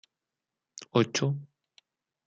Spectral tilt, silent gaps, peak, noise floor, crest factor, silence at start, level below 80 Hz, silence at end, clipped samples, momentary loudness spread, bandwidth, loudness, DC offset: -5 dB/octave; none; -10 dBFS; -88 dBFS; 22 dB; 0.8 s; -72 dBFS; 0.8 s; under 0.1%; 21 LU; 9 kHz; -29 LUFS; under 0.1%